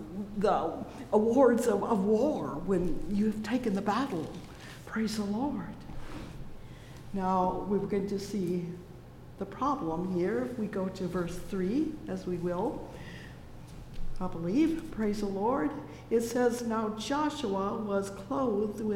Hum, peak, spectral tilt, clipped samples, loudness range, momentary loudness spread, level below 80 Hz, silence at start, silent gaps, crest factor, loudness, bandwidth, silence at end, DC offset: none; -12 dBFS; -6.5 dB/octave; under 0.1%; 7 LU; 18 LU; -48 dBFS; 0 s; none; 20 dB; -31 LUFS; 16.5 kHz; 0 s; under 0.1%